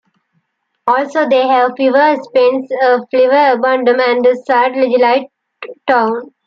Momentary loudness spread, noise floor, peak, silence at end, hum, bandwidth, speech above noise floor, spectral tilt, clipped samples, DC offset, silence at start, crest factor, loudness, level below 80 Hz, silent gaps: 6 LU; -65 dBFS; -2 dBFS; 0.2 s; none; 7 kHz; 53 dB; -5 dB/octave; under 0.1%; under 0.1%; 0.85 s; 12 dB; -12 LUFS; -68 dBFS; none